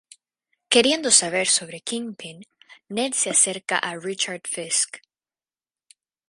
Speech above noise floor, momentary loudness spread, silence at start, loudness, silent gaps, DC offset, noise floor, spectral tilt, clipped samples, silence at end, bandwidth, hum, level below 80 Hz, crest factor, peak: over 67 dB; 14 LU; 0.7 s; -21 LUFS; none; under 0.1%; under -90 dBFS; -1 dB/octave; under 0.1%; 1.3 s; 11.5 kHz; none; -70 dBFS; 24 dB; 0 dBFS